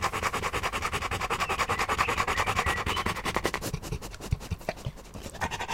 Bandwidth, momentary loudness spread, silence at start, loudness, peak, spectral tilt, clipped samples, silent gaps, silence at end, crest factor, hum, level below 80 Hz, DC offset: 16.5 kHz; 11 LU; 0 s; -30 LUFS; -8 dBFS; -3.5 dB/octave; under 0.1%; none; 0 s; 22 dB; none; -42 dBFS; under 0.1%